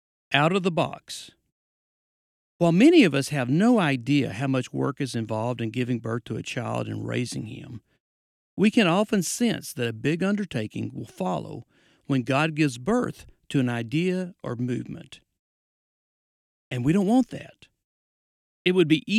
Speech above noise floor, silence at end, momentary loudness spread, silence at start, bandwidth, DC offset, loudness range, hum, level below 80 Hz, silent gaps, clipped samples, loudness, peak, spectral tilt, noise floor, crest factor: over 66 dB; 0 s; 14 LU; 0.3 s; 14.5 kHz; under 0.1%; 8 LU; none; -62 dBFS; 1.52-2.59 s, 8.00-8.57 s, 15.39-16.71 s, 17.84-18.65 s; under 0.1%; -25 LUFS; -4 dBFS; -6 dB/octave; under -90 dBFS; 20 dB